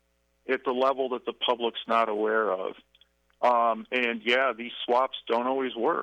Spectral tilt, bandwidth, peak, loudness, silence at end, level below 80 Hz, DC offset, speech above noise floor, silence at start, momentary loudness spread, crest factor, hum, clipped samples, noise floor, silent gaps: -4.5 dB/octave; 9.4 kHz; -10 dBFS; -27 LUFS; 0 s; -74 dBFS; under 0.1%; 33 dB; 0.5 s; 7 LU; 18 dB; none; under 0.1%; -60 dBFS; none